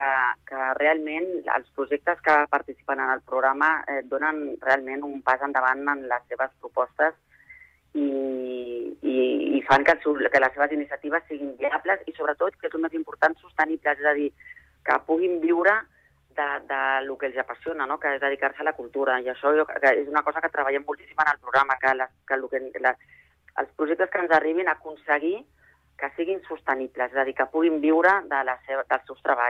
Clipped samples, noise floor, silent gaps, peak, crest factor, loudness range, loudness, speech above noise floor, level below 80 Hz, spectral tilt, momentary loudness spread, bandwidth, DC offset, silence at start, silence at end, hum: under 0.1%; -52 dBFS; none; -6 dBFS; 18 dB; 3 LU; -25 LUFS; 27 dB; -64 dBFS; -5.5 dB/octave; 9 LU; 8.4 kHz; under 0.1%; 0 s; 0 s; none